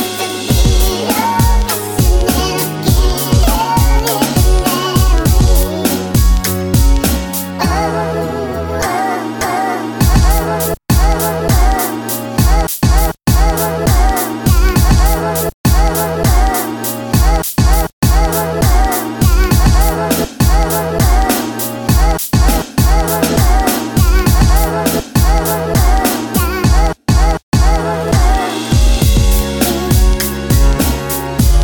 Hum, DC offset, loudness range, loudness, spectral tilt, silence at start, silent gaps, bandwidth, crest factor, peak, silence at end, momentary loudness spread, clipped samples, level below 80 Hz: none; under 0.1%; 2 LU; -13 LUFS; -5 dB/octave; 0 s; 15.54-15.64 s, 17.93-18.02 s, 27.43-27.52 s; over 20 kHz; 12 dB; 0 dBFS; 0 s; 5 LU; under 0.1%; -14 dBFS